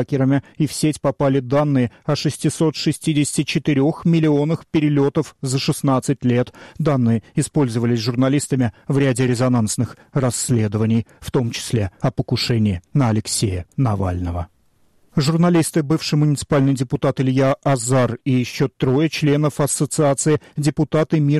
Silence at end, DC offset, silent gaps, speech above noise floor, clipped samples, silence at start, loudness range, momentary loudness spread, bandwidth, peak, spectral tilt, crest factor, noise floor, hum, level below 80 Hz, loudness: 0 s; 0.1%; none; 39 dB; under 0.1%; 0 s; 2 LU; 5 LU; 13.5 kHz; -8 dBFS; -6 dB/octave; 12 dB; -57 dBFS; none; -46 dBFS; -19 LUFS